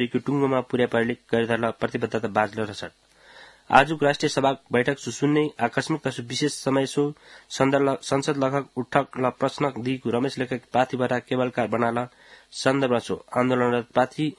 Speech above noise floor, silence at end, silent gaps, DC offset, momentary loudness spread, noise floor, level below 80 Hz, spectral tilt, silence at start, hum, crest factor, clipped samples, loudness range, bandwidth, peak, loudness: 26 dB; 0.05 s; none; under 0.1%; 7 LU; -50 dBFS; -60 dBFS; -5.5 dB/octave; 0 s; none; 24 dB; under 0.1%; 2 LU; 12 kHz; 0 dBFS; -24 LUFS